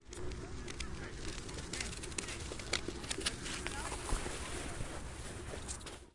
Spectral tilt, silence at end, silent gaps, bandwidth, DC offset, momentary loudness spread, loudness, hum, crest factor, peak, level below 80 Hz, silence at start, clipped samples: -3 dB/octave; 0.05 s; none; 12 kHz; under 0.1%; 8 LU; -42 LUFS; none; 26 dB; -16 dBFS; -48 dBFS; 0 s; under 0.1%